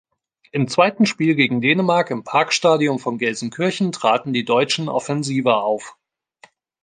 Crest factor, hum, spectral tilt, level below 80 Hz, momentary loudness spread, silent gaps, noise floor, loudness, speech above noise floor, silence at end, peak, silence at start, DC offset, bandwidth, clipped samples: 18 dB; none; -5 dB/octave; -66 dBFS; 7 LU; none; -53 dBFS; -19 LUFS; 34 dB; 0.9 s; -2 dBFS; 0.55 s; under 0.1%; 9.8 kHz; under 0.1%